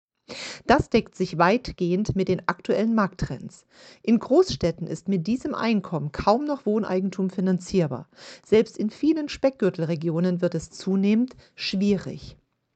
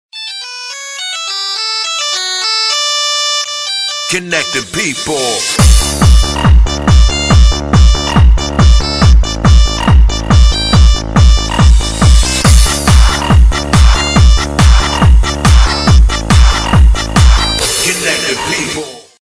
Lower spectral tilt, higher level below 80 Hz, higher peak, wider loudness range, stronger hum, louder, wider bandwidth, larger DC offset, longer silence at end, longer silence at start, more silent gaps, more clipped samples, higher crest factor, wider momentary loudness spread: first, -6.5 dB/octave vs -4 dB/octave; second, -48 dBFS vs -10 dBFS; second, -4 dBFS vs 0 dBFS; about the same, 2 LU vs 3 LU; neither; second, -24 LUFS vs -10 LUFS; second, 8.8 kHz vs 13 kHz; neither; first, 0.45 s vs 0.25 s; first, 0.3 s vs 0.15 s; neither; neither; first, 20 dB vs 8 dB; first, 12 LU vs 6 LU